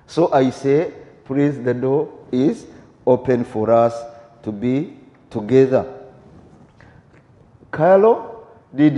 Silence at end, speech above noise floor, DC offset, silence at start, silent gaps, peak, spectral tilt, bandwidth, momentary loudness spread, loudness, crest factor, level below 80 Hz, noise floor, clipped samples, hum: 0 s; 33 dB; under 0.1%; 0.1 s; none; -2 dBFS; -8 dB/octave; 9.8 kHz; 17 LU; -18 LUFS; 18 dB; -56 dBFS; -50 dBFS; under 0.1%; none